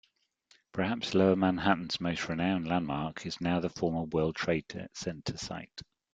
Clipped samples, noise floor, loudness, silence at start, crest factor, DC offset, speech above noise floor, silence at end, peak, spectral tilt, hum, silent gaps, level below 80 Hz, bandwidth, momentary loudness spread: under 0.1%; -68 dBFS; -31 LUFS; 0.75 s; 22 dB; under 0.1%; 37 dB; 0.3 s; -10 dBFS; -5.5 dB/octave; none; none; -60 dBFS; 7.8 kHz; 13 LU